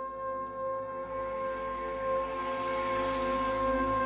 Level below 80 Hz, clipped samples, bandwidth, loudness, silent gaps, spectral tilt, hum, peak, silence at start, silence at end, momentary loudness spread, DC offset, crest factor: -52 dBFS; under 0.1%; 4 kHz; -33 LUFS; none; -3.5 dB/octave; none; -18 dBFS; 0 s; 0 s; 7 LU; under 0.1%; 14 dB